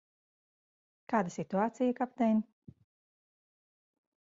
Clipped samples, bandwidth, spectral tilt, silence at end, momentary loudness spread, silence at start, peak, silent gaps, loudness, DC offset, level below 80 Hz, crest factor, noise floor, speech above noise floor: under 0.1%; 7.6 kHz; -7 dB/octave; 1.8 s; 4 LU; 1.1 s; -14 dBFS; none; -32 LUFS; under 0.1%; -78 dBFS; 22 dB; under -90 dBFS; over 59 dB